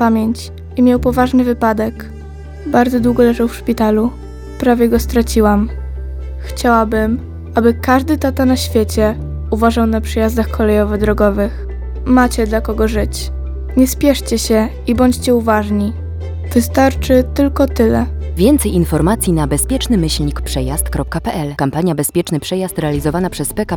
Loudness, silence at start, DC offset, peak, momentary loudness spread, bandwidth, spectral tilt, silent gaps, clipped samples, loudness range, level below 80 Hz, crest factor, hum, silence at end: -15 LUFS; 0 s; under 0.1%; 0 dBFS; 11 LU; 18.5 kHz; -5.5 dB/octave; none; under 0.1%; 2 LU; -24 dBFS; 14 dB; none; 0 s